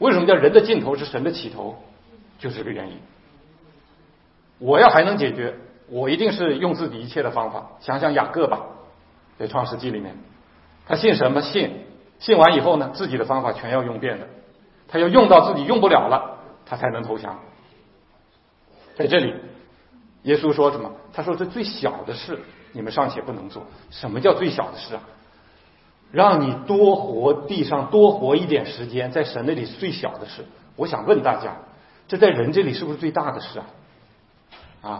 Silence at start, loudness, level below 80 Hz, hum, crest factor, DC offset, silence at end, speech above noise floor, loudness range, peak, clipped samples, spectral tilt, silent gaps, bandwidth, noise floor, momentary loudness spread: 0 s; -20 LUFS; -58 dBFS; none; 20 dB; under 0.1%; 0 s; 38 dB; 8 LU; 0 dBFS; under 0.1%; -9 dB/octave; none; 5.8 kHz; -57 dBFS; 20 LU